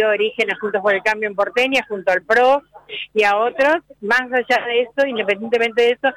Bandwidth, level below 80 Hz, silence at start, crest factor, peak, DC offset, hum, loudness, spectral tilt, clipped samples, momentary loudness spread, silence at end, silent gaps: 15 kHz; -60 dBFS; 0 s; 12 dB; -6 dBFS; under 0.1%; none; -18 LUFS; -3.5 dB/octave; under 0.1%; 5 LU; 0 s; none